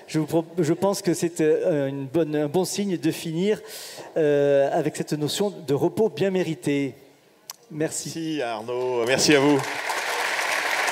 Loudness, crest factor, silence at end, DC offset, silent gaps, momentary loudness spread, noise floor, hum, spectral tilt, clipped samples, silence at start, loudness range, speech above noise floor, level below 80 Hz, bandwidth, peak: -24 LUFS; 18 dB; 0 s; under 0.1%; none; 9 LU; -45 dBFS; none; -4.5 dB/octave; under 0.1%; 0 s; 3 LU; 22 dB; -72 dBFS; 16 kHz; -4 dBFS